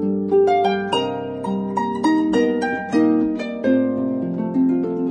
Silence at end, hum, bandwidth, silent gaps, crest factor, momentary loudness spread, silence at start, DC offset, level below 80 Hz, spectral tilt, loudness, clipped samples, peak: 0 s; none; 10 kHz; none; 14 dB; 6 LU; 0 s; under 0.1%; -56 dBFS; -6.5 dB/octave; -20 LUFS; under 0.1%; -6 dBFS